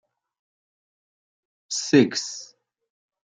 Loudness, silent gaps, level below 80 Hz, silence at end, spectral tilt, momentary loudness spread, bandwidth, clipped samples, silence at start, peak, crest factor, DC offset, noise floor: -22 LUFS; none; -74 dBFS; 0.8 s; -4 dB/octave; 15 LU; 9.6 kHz; under 0.1%; 1.7 s; -4 dBFS; 24 dB; under 0.1%; under -90 dBFS